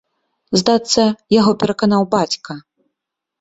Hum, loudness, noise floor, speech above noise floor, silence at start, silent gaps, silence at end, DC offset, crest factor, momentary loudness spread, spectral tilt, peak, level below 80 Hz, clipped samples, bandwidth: none; -16 LUFS; -80 dBFS; 65 dB; 0.5 s; none; 0.8 s; under 0.1%; 16 dB; 10 LU; -5 dB/octave; -2 dBFS; -54 dBFS; under 0.1%; 8.2 kHz